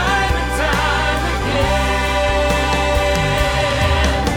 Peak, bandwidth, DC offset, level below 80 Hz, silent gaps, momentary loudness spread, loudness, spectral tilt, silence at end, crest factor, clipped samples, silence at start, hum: -2 dBFS; 17 kHz; under 0.1%; -22 dBFS; none; 2 LU; -17 LUFS; -4.5 dB/octave; 0 s; 14 dB; under 0.1%; 0 s; none